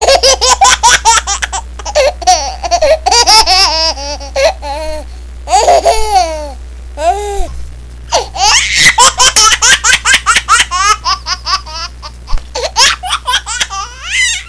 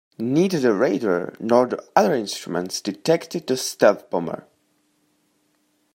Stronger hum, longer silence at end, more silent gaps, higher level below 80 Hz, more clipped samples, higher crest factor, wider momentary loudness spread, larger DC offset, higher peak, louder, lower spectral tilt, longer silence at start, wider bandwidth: neither; second, 0 s vs 1.55 s; neither; first, -24 dBFS vs -70 dBFS; first, 0.3% vs under 0.1%; second, 10 dB vs 20 dB; first, 17 LU vs 9 LU; first, 0.7% vs under 0.1%; about the same, 0 dBFS vs -2 dBFS; first, -8 LUFS vs -21 LUFS; second, 0 dB/octave vs -5 dB/octave; second, 0 s vs 0.2 s; second, 11 kHz vs 16.5 kHz